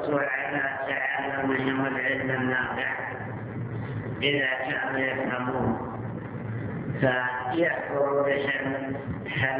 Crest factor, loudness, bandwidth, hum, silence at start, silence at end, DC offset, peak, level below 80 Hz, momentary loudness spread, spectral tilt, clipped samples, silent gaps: 18 dB; -27 LUFS; 4 kHz; none; 0 s; 0 s; under 0.1%; -10 dBFS; -54 dBFS; 9 LU; -4 dB/octave; under 0.1%; none